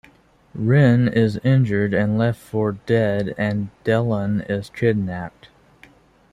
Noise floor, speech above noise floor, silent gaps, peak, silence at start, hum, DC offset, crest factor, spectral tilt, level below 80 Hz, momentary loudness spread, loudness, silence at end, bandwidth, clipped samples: -53 dBFS; 34 dB; none; -4 dBFS; 0.55 s; none; under 0.1%; 16 dB; -8.5 dB/octave; -52 dBFS; 10 LU; -20 LUFS; 1.05 s; 10.5 kHz; under 0.1%